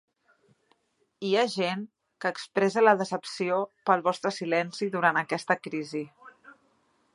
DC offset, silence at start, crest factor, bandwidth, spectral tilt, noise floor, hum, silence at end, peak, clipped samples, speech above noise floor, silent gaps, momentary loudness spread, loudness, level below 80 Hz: under 0.1%; 1.2 s; 22 dB; 11.5 kHz; -4.5 dB/octave; -70 dBFS; none; 0.65 s; -6 dBFS; under 0.1%; 43 dB; none; 13 LU; -27 LUFS; -80 dBFS